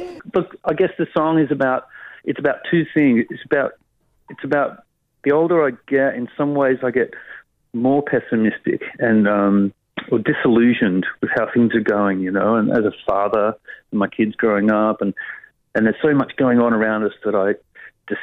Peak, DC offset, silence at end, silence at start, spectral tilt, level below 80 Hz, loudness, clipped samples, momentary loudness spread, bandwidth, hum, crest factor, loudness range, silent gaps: -6 dBFS; under 0.1%; 0 s; 0 s; -9.5 dB/octave; -58 dBFS; -19 LUFS; under 0.1%; 10 LU; 4.6 kHz; none; 14 dB; 3 LU; none